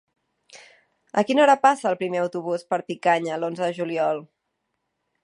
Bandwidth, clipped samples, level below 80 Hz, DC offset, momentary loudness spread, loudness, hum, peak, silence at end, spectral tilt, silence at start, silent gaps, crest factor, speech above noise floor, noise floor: 11 kHz; under 0.1%; -80 dBFS; under 0.1%; 11 LU; -23 LUFS; none; -4 dBFS; 1 s; -5 dB/octave; 0.55 s; none; 20 dB; 55 dB; -77 dBFS